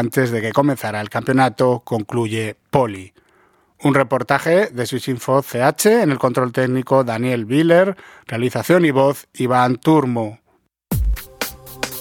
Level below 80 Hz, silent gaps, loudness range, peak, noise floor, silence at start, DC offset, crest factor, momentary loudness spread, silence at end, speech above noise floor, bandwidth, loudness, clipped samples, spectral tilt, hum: -36 dBFS; none; 3 LU; 0 dBFS; -63 dBFS; 0 s; under 0.1%; 18 dB; 10 LU; 0 s; 46 dB; 18.5 kHz; -18 LUFS; under 0.1%; -6 dB/octave; none